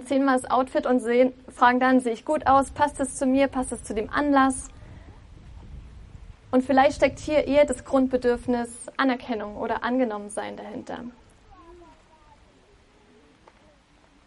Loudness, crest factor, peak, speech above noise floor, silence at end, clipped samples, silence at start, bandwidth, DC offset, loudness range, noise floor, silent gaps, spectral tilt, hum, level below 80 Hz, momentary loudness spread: -23 LUFS; 20 dB; -6 dBFS; 34 dB; 2.55 s; under 0.1%; 0 s; 11.5 kHz; under 0.1%; 10 LU; -58 dBFS; none; -4.5 dB/octave; none; -48 dBFS; 14 LU